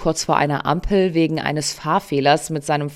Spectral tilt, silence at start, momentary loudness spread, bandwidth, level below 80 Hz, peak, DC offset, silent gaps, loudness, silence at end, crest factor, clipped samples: -5 dB/octave; 0 s; 5 LU; 16 kHz; -38 dBFS; -2 dBFS; under 0.1%; none; -19 LUFS; 0 s; 18 dB; under 0.1%